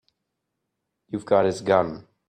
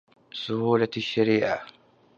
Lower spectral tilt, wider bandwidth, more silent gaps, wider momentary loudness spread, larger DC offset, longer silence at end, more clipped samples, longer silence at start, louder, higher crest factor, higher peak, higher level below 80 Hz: about the same, -6 dB/octave vs -6.5 dB/octave; first, 9.6 kHz vs 7.2 kHz; neither; about the same, 13 LU vs 11 LU; neither; second, 0.25 s vs 0.5 s; neither; first, 1.1 s vs 0.35 s; first, -22 LUFS vs -25 LUFS; about the same, 20 dB vs 18 dB; about the same, -6 dBFS vs -8 dBFS; about the same, -62 dBFS vs -66 dBFS